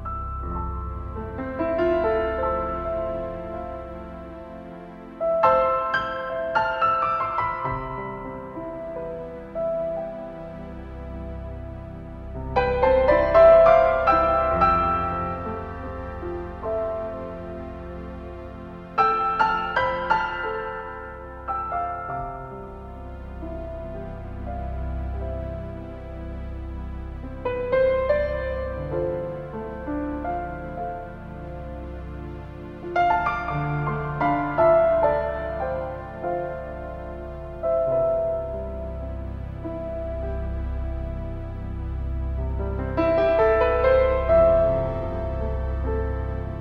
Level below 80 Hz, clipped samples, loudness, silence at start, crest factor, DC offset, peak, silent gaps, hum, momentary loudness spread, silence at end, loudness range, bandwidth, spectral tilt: -36 dBFS; under 0.1%; -24 LUFS; 0 s; 20 dB; under 0.1%; -4 dBFS; none; none; 18 LU; 0 s; 13 LU; 6.2 kHz; -8.5 dB/octave